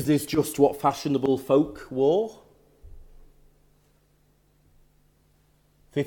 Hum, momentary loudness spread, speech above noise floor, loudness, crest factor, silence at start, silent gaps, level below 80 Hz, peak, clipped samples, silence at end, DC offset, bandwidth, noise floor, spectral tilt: 50 Hz at -65 dBFS; 7 LU; 40 dB; -24 LUFS; 22 dB; 0 s; none; -56 dBFS; -6 dBFS; under 0.1%; 0 s; under 0.1%; 18 kHz; -63 dBFS; -6 dB/octave